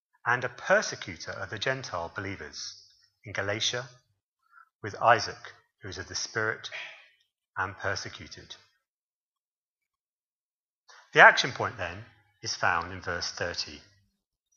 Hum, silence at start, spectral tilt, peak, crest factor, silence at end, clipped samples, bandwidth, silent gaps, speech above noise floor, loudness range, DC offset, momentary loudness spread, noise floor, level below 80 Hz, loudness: none; 0.25 s; -2.5 dB/octave; -2 dBFS; 28 dB; 0.75 s; under 0.1%; 7.4 kHz; 4.23-4.37 s, 4.75-4.80 s, 8.88-9.32 s, 9.38-9.76 s, 9.99-10.85 s; over 61 dB; 14 LU; under 0.1%; 20 LU; under -90 dBFS; -64 dBFS; -27 LUFS